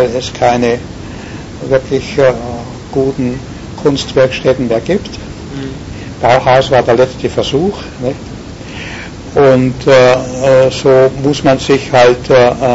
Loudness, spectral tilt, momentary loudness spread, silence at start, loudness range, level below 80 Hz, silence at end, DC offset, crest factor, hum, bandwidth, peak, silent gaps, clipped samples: -11 LUFS; -5.5 dB/octave; 17 LU; 0 s; 6 LU; -34 dBFS; 0 s; under 0.1%; 12 dB; none; 8 kHz; 0 dBFS; none; under 0.1%